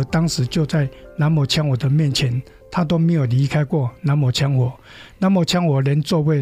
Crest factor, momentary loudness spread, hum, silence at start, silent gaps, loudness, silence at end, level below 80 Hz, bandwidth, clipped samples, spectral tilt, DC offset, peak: 12 dB; 5 LU; none; 0 s; none; -19 LUFS; 0 s; -46 dBFS; 15.5 kHz; under 0.1%; -6.5 dB/octave; under 0.1%; -6 dBFS